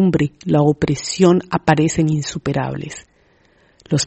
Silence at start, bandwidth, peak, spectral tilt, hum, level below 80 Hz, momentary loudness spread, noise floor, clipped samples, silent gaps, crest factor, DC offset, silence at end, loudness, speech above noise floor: 0 s; 8.6 kHz; 0 dBFS; -6 dB/octave; none; -46 dBFS; 11 LU; -55 dBFS; under 0.1%; none; 18 dB; under 0.1%; 0 s; -17 LUFS; 39 dB